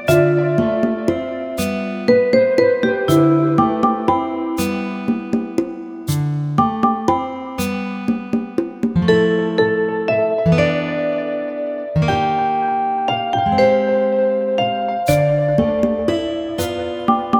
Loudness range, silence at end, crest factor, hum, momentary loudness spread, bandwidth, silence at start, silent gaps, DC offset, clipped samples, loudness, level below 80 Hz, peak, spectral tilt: 4 LU; 0 s; 16 dB; none; 8 LU; over 20 kHz; 0 s; none; under 0.1%; under 0.1%; -18 LUFS; -46 dBFS; -2 dBFS; -6.5 dB/octave